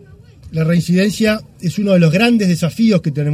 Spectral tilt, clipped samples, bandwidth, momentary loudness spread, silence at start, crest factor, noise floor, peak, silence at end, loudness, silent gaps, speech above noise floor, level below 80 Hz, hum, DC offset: -6.5 dB/octave; under 0.1%; 15 kHz; 8 LU; 0.45 s; 14 dB; -39 dBFS; 0 dBFS; 0 s; -14 LUFS; none; 25 dB; -46 dBFS; none; under 0.1%